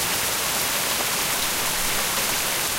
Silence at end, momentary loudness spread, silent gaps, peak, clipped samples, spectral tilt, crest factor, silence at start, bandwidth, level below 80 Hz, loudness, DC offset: 0 s; 0 LU; none; -8 dBFS; under 0.1%; -0.5 dB/octave; 16 dB; 0 s; 16 kHz; -44 dBFS; -21 LUFS; under 0.1%